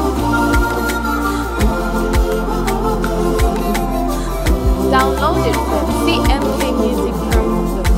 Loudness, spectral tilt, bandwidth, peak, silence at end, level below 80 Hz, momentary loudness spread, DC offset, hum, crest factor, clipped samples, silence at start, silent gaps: -16 LUFS; -5.5 dB/octave; 16 kHz; 0 dBFS; 0 s; -20 dBFS; 4 LU; under 0.1%; none; 14 dB; under 0.1%; 0 s; none